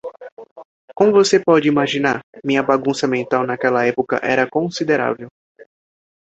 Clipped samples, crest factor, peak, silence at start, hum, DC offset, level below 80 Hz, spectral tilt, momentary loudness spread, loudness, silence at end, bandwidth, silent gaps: under 0.1%; 18 dB; -2 dBFS; 0.05 s; none; under 0.1%; -62 dBFS; -5 dB/octave; 8 LU; -17 LUFS; 1 s; 8.2 kHz; 0.32-0.37 s, 0.51-0.56 s, 0.65-0.88 s, 2.23-2.33 s